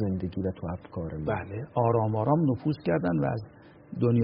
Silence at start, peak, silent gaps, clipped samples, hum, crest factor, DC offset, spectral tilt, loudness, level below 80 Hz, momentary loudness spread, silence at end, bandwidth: 0 s; -12 dBFS; none; under 0.1%; none; 16 dB; under 0.1%; -9 dB/octave; -29 LUFS; -52 dBFS; 11 LU; 0 s; 5.4 kHz